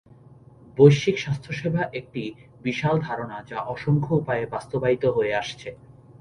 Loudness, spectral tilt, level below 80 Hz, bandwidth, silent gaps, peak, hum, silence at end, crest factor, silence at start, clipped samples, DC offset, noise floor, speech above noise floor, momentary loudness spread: -24 LUFS; -7 dB/octave; -56 dBFS; 10 kHz; none; -2 dBFS; none; 0.45 s; 22 dB; 0.75 s; under 0.1%; under 0.1%; -50 dBFS; 26 dB; 17 LU